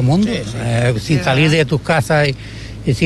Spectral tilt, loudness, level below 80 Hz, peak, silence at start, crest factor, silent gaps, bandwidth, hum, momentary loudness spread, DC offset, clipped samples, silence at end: -6 dB/octave; -16 LUFS; -36 dBFS; -2 dBFS; 0 s; 12 dB; none; 12.5 kHz; none; 9 LU; under 0.1%; under 0.1%; 0 s